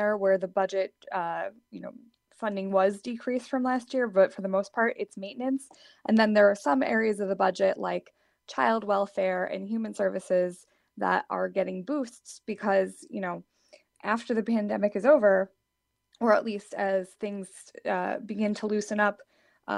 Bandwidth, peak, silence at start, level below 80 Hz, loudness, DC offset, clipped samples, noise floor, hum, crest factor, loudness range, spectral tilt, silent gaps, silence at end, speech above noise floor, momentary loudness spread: 11.5 kHz; -8 dBFS; 0 s; -76 dBFS; -28 LUFS; under 0.1%; under 0.1%; -80 dBFS; none; 20 dB; 5 LU; -6 dB/octave; none; 0 s; 53 dB; 13 LU